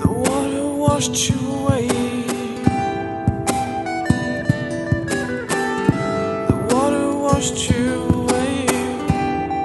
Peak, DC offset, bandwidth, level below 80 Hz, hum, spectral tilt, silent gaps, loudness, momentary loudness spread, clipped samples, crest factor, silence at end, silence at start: 0 dBFS; under 0.1%; 12 kHz; -38 dBFS; none; -5 dB/octave; none; -20 LUFS; 4 LU; under 0.1%; 18 dB; 0 s; 0 s